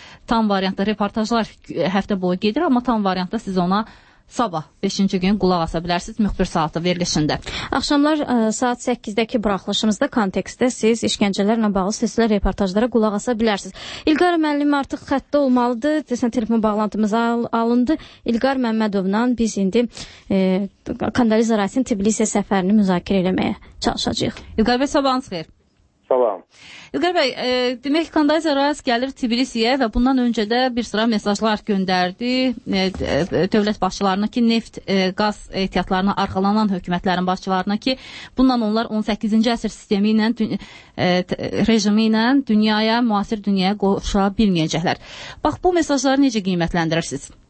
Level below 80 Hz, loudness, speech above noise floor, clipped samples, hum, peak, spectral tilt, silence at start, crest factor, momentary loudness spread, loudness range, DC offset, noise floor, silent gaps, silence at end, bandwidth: -40 dBFS; -19 LUFS; 40 dB; under 0.1%; none; -4 dBFS; -5 dB/octave; 0 s; 16 dB; 6 LU; 3 LU; under 0.1%; -59 dBFS; none; 0.15 s; 8.8 kHz